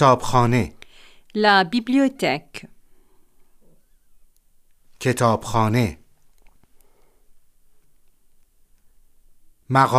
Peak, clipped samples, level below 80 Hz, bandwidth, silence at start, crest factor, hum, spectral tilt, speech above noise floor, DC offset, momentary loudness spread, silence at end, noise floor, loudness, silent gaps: -2 dBFS; under 0.1%; -48 dBFS; 15.5 kHz; 0 s; 22 dB; none; -5.5 dB/octave; 37 dB; under 0.1%; 13 LU; 0 s; -55 dBFS; -20 LUFS; none